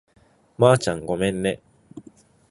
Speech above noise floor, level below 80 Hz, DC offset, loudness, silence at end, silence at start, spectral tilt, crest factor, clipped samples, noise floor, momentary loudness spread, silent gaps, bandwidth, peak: 31 dB; -52 dBFS; under 0.1%; -21 LUFS; 0.5 s; 0.6 s; -5.5 dB/octave; 22 dB; under 0.1%; -52 dBFS; 10 LU; none; 11.5 kHz; -2 dBFS